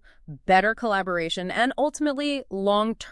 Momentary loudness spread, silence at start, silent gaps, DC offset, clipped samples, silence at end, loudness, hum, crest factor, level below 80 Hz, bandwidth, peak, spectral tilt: 7 LU; 0.3 s; none; under 0.1%; under 0.1%; 0 s; -24 LUFS; none; 18 dB; -52 dBFS; 12 kHz; -6 dBFS; -4.5 dB/octave